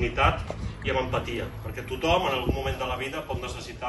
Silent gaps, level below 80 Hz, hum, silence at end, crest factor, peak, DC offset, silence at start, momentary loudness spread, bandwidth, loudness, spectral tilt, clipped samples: none; -38 dBFS; none; 0 s; 22 dB; -6 dBFS; under 0.1%; 0 s; 11 LU; 12.5 kHz; -28 LUFS; -5.5 dB/octave; under 0.1%